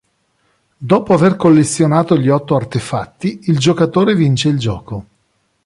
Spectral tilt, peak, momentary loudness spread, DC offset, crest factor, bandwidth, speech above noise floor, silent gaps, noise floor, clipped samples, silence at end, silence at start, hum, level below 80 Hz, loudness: -6.5 dB/octave; -2 dBFS; 12 LU; under 0.1%; 14 dB; 11.5 kHz; 50 dB; none; -63 dBFS; under 0.1%; 0.65 s; 0.8 s; none; -46 dBFS; -14 LUFS